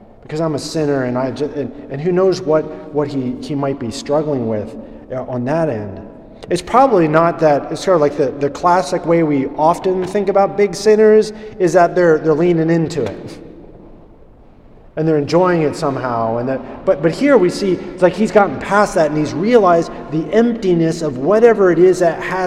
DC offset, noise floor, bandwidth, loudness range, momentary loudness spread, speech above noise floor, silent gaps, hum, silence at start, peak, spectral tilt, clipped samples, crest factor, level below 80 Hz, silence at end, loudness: under 0.1%; -42 dBFS; 13 kHz; 6 LU; 11 LU; 28 dB; none; none; 0.3 s; 0 dBFS; -6.5 dB/octave; under 0.1%; 14 dB; -44 dBFS; 0 s; -15 LUFS